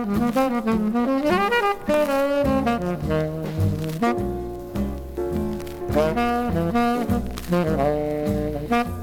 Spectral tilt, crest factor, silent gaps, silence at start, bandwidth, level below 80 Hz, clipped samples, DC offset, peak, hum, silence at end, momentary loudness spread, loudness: -7 dB/octave; 14 dB; none; 0 s; 19 kHz; -38 dBFS; under 0.1%; under 0.1%; -8 dBFS; none; 0 s; 8 LU; -23 LUFS